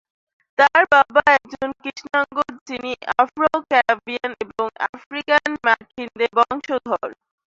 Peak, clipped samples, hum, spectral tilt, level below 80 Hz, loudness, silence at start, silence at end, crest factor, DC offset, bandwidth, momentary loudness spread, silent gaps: 0 dBFS; under 0.1%; none; -3.5 dB/octave; -60 dBFS; -19 LUFS; 0.6 s; 0.4 s; 20 dB; under 0.1%; 7.8 kHz; 14 LU; 2.61-2.66 s, 4.89-4.93 s, 5.06-5.11 s